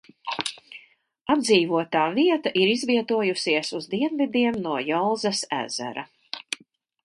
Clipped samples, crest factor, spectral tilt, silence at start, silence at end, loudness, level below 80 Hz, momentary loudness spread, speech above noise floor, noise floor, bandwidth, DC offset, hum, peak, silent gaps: under 0.1%; 20 dB; -4 dB/octave; 0.25 s; 0.5 s; -24 LUFS; -68 dBFS; 15 LU; 34 dB; -58 dBFS; 11.5 kHz; under 0.1%; none; -6 dBFS; none